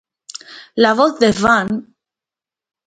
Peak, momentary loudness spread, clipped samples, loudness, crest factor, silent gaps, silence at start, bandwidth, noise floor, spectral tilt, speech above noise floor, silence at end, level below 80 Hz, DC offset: 0 dBFS; 20 LU; under 0.1%; -15 LUFS; 18 dB; none; 0.5 s; 9.4 kHz; -89 dBFS; -4.5 dB/octave; 75 dB; 1.05 s; -50 dBFS; under 0.1%